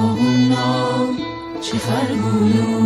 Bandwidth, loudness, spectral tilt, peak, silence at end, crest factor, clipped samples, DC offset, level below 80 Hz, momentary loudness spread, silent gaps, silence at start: 12.5 kHz; -18 LUFS; -6 dB/octave; -4 dBFS; 0 s; 14 dB; under 0.1%; under 0.1%; -50 dBFS; 9 LU; none; 0 s